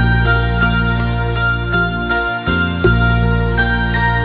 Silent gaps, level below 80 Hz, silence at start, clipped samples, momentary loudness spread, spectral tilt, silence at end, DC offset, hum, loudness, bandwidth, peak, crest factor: none; -22 dBFS; 0 s; under 0.1%; 3 LU; -10 dB/octave; 0 s; under 0.1%; none; -15 LUFS; 5 kHz; -2 dBFS; 12 dB